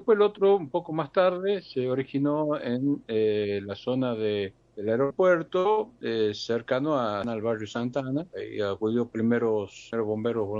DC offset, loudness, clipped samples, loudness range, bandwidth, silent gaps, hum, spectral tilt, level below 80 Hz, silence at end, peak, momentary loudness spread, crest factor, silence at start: under 0.1%; -27 LUFS; under 0.1%; 2 LU; 7.4 kHz; none; none; -7 dB/octave; -66 dBFS; 0 s; -10 dBFS; 8 LU; 16 dB; 0 s